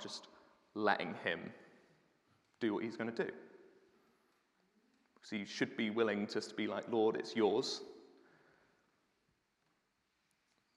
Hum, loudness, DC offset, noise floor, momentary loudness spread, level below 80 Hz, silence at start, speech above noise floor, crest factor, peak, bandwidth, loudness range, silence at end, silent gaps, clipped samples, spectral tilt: none; -38 LUFS; under 0.1%; -81 dBFS; 13 LU; under -90 dBFS; 0 s; 44 dB; 24 dB; -16 dBFS; 11 kHz; 8 LU; 2.7 s; none; under 0.1%; -4.5 dB/octave